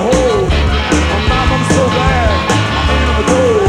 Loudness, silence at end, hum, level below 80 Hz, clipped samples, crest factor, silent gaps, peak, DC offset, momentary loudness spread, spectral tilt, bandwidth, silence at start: -12 LUFS; 0 s; none; -18 dBFS; under 0.1%; 10 dB; none; -2 dBFS; under 0.1%; 2 LU; -5 dB/octave; 11 kHz; 0 s